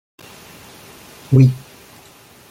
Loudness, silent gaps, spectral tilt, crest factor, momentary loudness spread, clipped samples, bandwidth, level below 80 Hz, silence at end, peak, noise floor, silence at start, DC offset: -14 LUFS; none; -8.5 dB/octave; 18 dB; 26 LU; under 0.1%; 15.5 kHz; -52 dBFS; 0.95 s; -2 dBFS; -46 dBFS; 1.3 s; under 0.1%